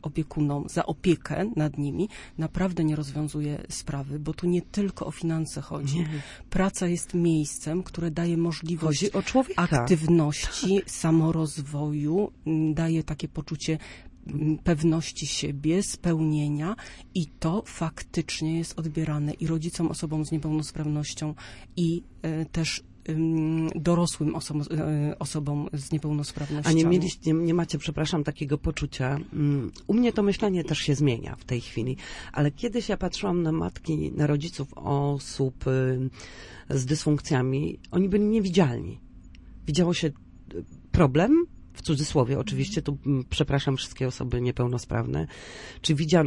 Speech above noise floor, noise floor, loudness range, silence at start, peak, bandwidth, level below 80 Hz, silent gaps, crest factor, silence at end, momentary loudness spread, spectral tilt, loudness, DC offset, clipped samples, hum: 20 dB; -47 dBFS; 4 LU; 0.05 s; -6 dBFS; 11.5 kHz; -46 dBFS; none; 20 dB; 0 s; 10 LU; -6 dB/octave; -27 LUFS; under 0.1%; under 0.1%; none